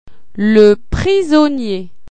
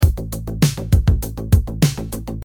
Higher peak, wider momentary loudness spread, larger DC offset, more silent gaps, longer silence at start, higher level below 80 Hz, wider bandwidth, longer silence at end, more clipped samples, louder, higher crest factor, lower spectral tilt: about the same, 0 dBFS vs -2 dBFS; about the same, 12 LU vs 11 LU; first, 5% vs under 0.1%; neither; first, 0.35 s vs 0 s; second, -32 dBFS vs -22 dBFS; second, 9.2 kHz vs 19 kHz; first, 0.25 s vs 0 s; first, 0.1% vs under 0.1%; first, -12 LUFS vs -19 LUFS; about the same, 14 dB vs 16 dB; about the same, -6.5 dB/octave vs -6 dB/octave